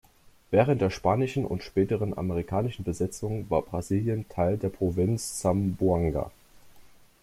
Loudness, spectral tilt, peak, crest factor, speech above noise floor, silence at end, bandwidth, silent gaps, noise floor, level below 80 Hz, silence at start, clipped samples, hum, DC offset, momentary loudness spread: -28 LUFS; -7 dB/octave; -8 dBFS; 20 dB; 26 dB; 0.35 s; 15.5 kHz; none; -53 dBFS; -50 dBFS; 0.5 s; under 0.1%; none; under 0.1%; 6 LU